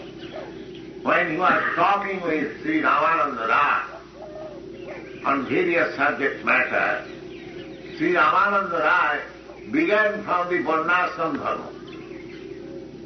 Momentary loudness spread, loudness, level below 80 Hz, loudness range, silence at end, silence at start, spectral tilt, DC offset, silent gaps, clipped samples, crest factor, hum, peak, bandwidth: 18 LU; -21 LUFS; -58 dBFS; 3 LU; 0 s; 0 s; -2.5 dB/octave; under 0.1%; none; under 0.1%; 16 dB; none; -6 dBFS; 6.4 kHz